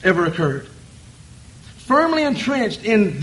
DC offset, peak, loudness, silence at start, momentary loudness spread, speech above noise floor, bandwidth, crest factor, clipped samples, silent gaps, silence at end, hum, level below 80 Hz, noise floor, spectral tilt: under 0.1%; -2 dBFS; -19 LUFS; 0 s; 7 LU; 25 dB; 11.5 kHz; 18 dB; under 0.1%; none; 0 s; none; -50 dBFS; -43 dBFS; -6 dB/octave